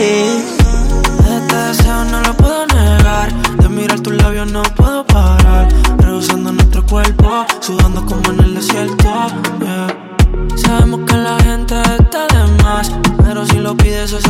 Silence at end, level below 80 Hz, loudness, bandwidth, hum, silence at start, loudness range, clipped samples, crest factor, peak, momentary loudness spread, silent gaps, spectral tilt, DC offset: 0 s; -14 dBFS; -12 LUFS; 16.5 kHz; none; 0 s; 2 LU; under 0.1%; 10 dB; 0 dBFS; 5 LU; none; -5.5 dB/octave; under 0.1%